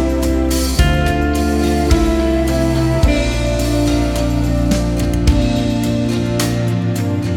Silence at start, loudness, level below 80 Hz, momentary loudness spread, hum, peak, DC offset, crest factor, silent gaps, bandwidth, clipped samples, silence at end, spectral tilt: 0 s; -16 LUFS; -20 dBFS; 3 LU; none; 0 dBFS; under 0.1%; 14 dB; none; 18 kHz; under 0.1%; 0 s; -6 dB/octave